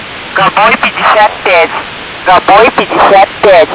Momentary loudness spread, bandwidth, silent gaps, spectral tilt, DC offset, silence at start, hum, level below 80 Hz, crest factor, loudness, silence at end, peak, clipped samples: 9 LU; 4 kHz; none; -7.5 dB/octave; under 0.1%; 0 s; none; -38 dBFS; 6 dB; -6 LUFS; 0 s; 0 dBFS; 7%